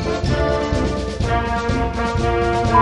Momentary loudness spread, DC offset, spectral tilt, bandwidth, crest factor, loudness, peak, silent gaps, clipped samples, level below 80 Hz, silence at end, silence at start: 3 LU; under 0.1%; -6.5 dB/octave; 11 kHz; 18 dB; -20 LUFS; 0 dBFS; none; under 0.1%; -26 dBFS; 0 s; 0 s